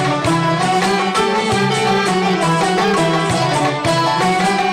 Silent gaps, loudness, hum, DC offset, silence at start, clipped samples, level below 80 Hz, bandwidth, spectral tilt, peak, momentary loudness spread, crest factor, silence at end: none; -15 LUFS; none; under 0.1%; 0 s; under 0.1%; -46 dBFS; 15 kHz; -4.5 dB/octave; -8 dBFS; 1 LU; 8 dB; 0 s